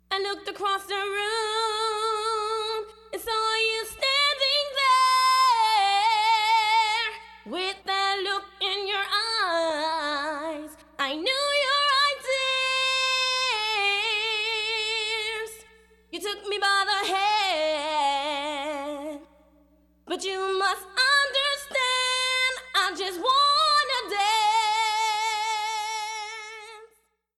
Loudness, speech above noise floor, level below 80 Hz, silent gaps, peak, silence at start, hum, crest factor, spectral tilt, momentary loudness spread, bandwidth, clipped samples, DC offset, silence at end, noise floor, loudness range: -24 LUFS; 37 dB; -64 dBFS; none; -10 dBFS; 0.1 s; none; 14 dB; 0.5 dB/octave; 12 LU; 17 kHz; under 0.1%; under 0.1%; 0.5 s; -66 dBFS; 5 LU